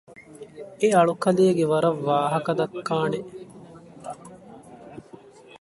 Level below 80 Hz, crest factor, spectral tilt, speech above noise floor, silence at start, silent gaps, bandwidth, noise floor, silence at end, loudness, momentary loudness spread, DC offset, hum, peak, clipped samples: -66 dBFS; 18 dB; -6.5 dB/octave; 26 dB; 0.1 s; none; 11.5 kHz; -48 dBFS; 0.05 s; -22 LUFS; 24 LU; under 0.1%; none; -6 dBFS; under 0.1%